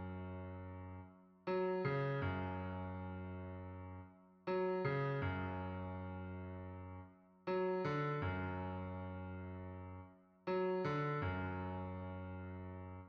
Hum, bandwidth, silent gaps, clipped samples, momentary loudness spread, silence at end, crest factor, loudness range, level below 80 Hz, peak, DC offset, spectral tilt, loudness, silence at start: none; 6.4 kHz; none; under 0.1%; 14 LU; 0 s; 16 dB; 0 LU; -66 dBFS; -26 dBFS; under 0.1%; -9 dB/octave; -43 LUFS; 0 s